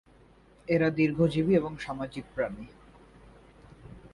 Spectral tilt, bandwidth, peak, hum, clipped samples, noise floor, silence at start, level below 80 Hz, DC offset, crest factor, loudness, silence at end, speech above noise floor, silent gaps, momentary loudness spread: -8 dB/octave; 11.5 kHz; -12 dBFS; none; under 0.1%; -58 dBFS; 0.7 s; -56 dBFS; under 0.1%; 18 dB; -28 LUFS; 0.05 s; 30 dB; none; 23 LU